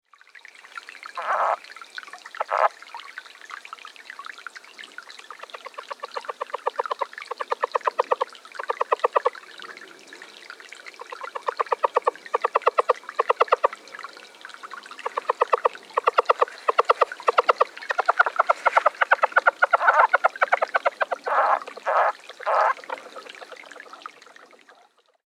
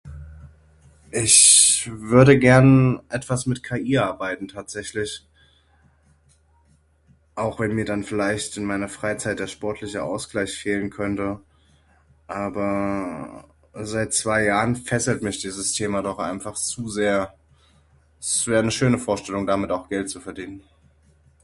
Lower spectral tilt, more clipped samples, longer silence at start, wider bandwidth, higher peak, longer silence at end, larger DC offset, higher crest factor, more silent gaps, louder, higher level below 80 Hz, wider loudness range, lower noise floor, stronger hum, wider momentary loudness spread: second, -0.5 dB/octave vs -4 dB/octave; neither; first, 0.75 s vs 0.05 s; first, 14 kHz vs 11.5 kHz; second, -4 dBFS vs 0 dBFS; first, 1.5 s vs 0.85 s; neither; about the same, 22 dB vs 22 dB; neither; second, -23 LUFS vs -20 LUFS; second, -78 dBFS vs -50 dBFS; second, 11 LU vs 14 LU; about the same, -59 dBFS vs -59 dBFS; neither; about the same, 20 LU vs 19 LU